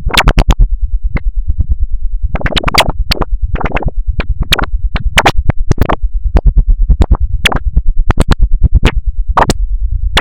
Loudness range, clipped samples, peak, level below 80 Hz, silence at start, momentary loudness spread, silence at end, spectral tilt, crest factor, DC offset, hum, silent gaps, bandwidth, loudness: 2 LU; 2%; 0 dBFS; -12 dBFS; 0 s; 9 LU; 0 s; -4.5 dB/octave; 10 dB; 10%; none; none; 17 kHz; -14 LUFS